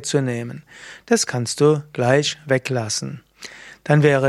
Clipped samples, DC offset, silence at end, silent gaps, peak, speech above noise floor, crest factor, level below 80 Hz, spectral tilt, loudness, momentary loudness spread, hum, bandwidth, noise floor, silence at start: under 0.1%; under 0.1%; 0 s; none; -2 dBFS; 21 dB; 18 dB; -62 dBFS; -5 dB/octave; -20 LUFS; 20 LU; none; 13.5 kHz; -40 dBFS; 0 s